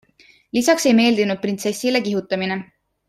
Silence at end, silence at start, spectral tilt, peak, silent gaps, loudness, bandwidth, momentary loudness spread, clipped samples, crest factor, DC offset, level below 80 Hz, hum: 0.45 s; 0.55 s; -4 dB/octave; -2 dBFS; none; -19 LUFS; 15 kHz; 9 LU; under 0.1%; 18 dB; under 0.1%; -64 dBFS; none